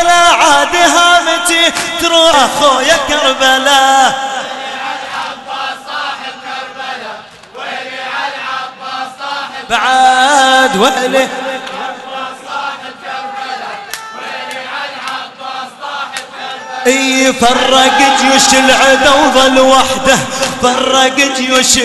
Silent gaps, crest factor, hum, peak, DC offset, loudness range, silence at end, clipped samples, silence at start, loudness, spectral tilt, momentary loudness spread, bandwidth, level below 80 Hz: none; 12 dB; none; 0 dBFS; under 0.1%; 14 LU; 0 s; under 0.1%; 0 s; -10 LUFS; -1 dB/octave; 16 LU; 12.5 kHz; -42 dBFS